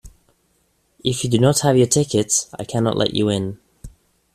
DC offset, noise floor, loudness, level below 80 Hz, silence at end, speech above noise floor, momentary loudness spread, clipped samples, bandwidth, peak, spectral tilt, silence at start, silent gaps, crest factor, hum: under 0.1%; -64 dBFS; -19 LUFS; -48 dBFS; 0.45 s; 46 dB; 11 LU; under 0.1%; 14.5 kHz; -2 dBFS; -4.5 dB/octave; 0.05 s; none; 18 dB; none